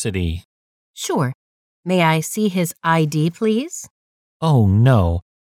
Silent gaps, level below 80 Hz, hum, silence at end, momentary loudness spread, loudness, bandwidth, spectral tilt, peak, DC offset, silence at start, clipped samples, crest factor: 0.45-0.94 s, 1.35-1.83 s, 3.90-4.40 s; -40 dBFS; none; 0.35 s; 15 LU; -18 LUFS; 17 kHz; -6 dB/octave; -2 dBFS; under 0.1%; 0 s; under 0.1%; 16 dB